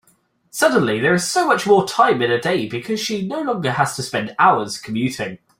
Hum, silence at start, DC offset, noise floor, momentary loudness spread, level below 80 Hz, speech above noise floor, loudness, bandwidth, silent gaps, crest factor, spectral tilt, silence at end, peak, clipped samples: none; 0.55 s; under 0.1%; -60 dBFS; 8 LU; -58 dBFS; 42 dB; -18 LUFS; 16.5 kHz; none; 18 dB; -4.5 dB/octave; 0.25 s; -2 dBFS; under 0.1%